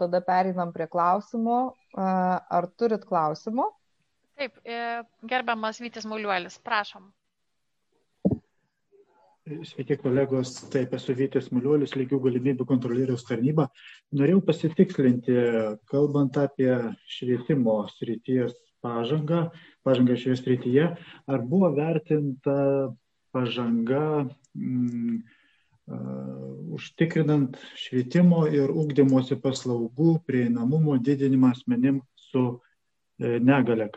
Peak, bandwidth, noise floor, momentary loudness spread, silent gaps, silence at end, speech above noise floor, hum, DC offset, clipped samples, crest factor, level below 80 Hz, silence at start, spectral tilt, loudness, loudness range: -6 dBFS; 8.2 kHz; -81 dBFS; 12 LU; none; 0 s; 56 dB; none; under 0.1%; under 0.1%; 18 dB; -66 dBFS; 0 s; -8 dB/octave; -26 LUFS; 7 LU